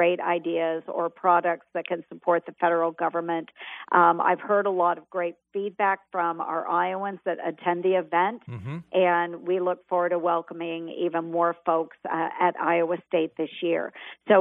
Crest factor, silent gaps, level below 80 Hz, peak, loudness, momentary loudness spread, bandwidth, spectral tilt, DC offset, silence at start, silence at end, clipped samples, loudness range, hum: 20 dB; none; -78 dBFS; -6 dBFS; -26 LUFS; 9 LU; 3.9 kHz; -9 dB/octave; under 0.1%; 0 s; 0 s; under 0.1%; 2 LU; none